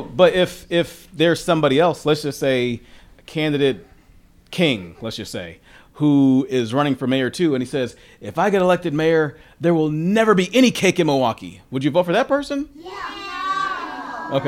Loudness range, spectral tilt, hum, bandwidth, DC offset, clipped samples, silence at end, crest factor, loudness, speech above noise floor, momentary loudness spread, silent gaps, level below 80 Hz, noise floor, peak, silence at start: 5 LU; -5.5 dB/octave; none; 16 kHz; under 0.1%; under 0.1%; 0 s; 18 dB; -19 LUFS; 31 dB; 14 LU; none; -52 dBFS; -50 dBFS; -2 dBFS; 0 s